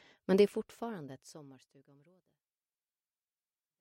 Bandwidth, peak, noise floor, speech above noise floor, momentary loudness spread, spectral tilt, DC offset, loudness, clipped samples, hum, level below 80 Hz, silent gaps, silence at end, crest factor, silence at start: 15.5 kHz; -14 dBFS; under -90 dBFS; over 55 dB; 24 LU; -6.5 dB/octave; under 0.1%; -32 LUFS; under 0.1%; none; -78 dBFS; none; 2.35 s; 24 dB; 0.3 s